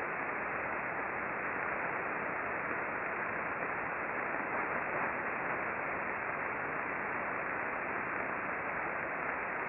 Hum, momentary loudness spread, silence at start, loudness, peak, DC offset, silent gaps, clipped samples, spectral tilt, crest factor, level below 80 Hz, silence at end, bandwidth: none; 1 LU; 0 s; -36 LUFS; -20 dBFS; under 0.1%; none; under 0.1%; -4.5 dB/octave; 16 dB; -66 dBFS; 0 s; 5.2 kHz